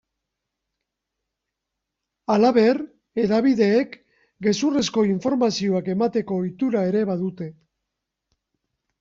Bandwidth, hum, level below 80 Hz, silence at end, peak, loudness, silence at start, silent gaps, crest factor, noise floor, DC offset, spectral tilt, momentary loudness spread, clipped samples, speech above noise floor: 7.8 kHz; none; -62 dBFS; 1.5 s; -6 dBFS; -21 LUFS; 2.3 s; none; 16 dB; -83 dBFS; under 0.1%; -6 dB/octave; 11 LU; under 0.1%; 62 dB